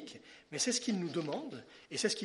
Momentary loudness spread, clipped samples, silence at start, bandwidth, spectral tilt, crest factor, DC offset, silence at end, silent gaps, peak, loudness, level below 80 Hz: 18 LU; under 0.1%; 0 s; 11.5 kHz; -3 dB/octave; 18 dB; under 0.1%; 0 s; none; -18 dBFS; -36 LUFS; -80 dBFS